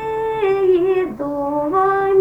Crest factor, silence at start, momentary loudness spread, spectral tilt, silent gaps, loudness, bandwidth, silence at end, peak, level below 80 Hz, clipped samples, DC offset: 12 dB; 0 s; 7 LU; -7.5 dB/octave; none; -18 LUFS; 5.4 kHz; 0 s; -6 dBFS; -48 dBFS; under 0.1%; under 0.1%